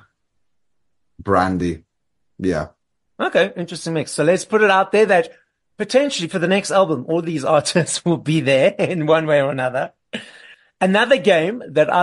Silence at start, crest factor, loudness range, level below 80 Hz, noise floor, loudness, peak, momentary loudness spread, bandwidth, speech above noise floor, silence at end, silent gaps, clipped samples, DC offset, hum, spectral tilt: 1.2 s; 16 dB; 5 LU; -54 dBFS; -78 dBFS; -18 LUFS; -2 dBFS; 11 LU; 11.5 kHz; 60 dB; 0 s; none; under 0.1%; under 0.1%; none; -5 dB/octave